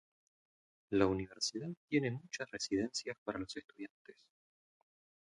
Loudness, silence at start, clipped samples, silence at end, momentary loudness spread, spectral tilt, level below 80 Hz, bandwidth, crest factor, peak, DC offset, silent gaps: -38 LUFS; 0.9 s; under 0.1%; 1.1 s; 13 LU; -4.5 dB/octave; -66 dBFS; 11.5 kHz; 24 dB; -16 dBFS; under 0.1%; 1.77-1.88 s, 3.18-3.26 s, 3.90-4.05 s